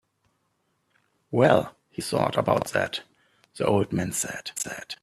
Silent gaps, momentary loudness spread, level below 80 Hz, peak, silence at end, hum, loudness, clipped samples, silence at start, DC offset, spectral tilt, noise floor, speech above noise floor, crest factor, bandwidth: none; 12 LU; -60 dBFS; -2 dBFS; 0.05 s; none; -25 LUFS; under 0.1%; 1.3 s; under 0.1%; -4.5 dB/octave; -73 dBFS; 48 dB; 24 dB; 15.5 kHz